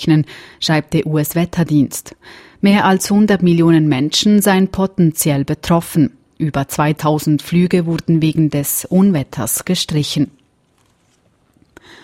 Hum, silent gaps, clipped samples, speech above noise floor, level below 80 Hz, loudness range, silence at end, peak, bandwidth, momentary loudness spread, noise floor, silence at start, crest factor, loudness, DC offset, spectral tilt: none; none; under 0.1%; 43 dB; -46 dBFS; 4 LU; 1.75 s; -2 dBFS; 16.5 kHz; 7 LU; -58 dBFS; 0 s; 14 dB; -15 LUFS; under 0.1%; -5.5 dB/octave